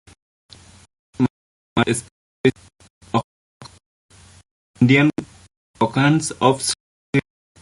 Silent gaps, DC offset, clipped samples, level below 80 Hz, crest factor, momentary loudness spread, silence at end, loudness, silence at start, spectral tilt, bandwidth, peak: 1.30-1.76 s, 2.11-2.44 s, 2.90-3.01 s, 3.24-3.60 s, 3.86-4.09 s, 4.51-4.74 s, 5.57-5.74 s, 6.80-7.13 s; under 0.1%; under 0.1%; -54 dBFS; 20 dB; 9 LU; 0.4 s; -20 LUFS; 1.2 s; -5 dB/octave; 11.5 kHz; -2 dBFS